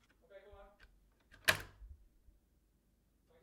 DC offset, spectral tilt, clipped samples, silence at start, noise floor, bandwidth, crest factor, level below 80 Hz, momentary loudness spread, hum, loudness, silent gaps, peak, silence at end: under 0.1%; -1.5 dB/octave; under 0.1%; 0.35 s; -75 dBFS; 16 kHz; 34 dB; -64 dBFS; 27 LU; none; -36 LUFS; none; -12 dBFS; 1.5 s